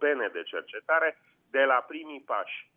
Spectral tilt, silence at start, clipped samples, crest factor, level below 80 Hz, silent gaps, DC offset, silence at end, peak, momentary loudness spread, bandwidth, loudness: -4.5 dB/octave; 0 s; under 0.1%; 18 dB; under -90 dBFS; none; under 0.1%; 0.15 s; -12 dBFS; 12 LU; 3.7 kHz; -28 LUFS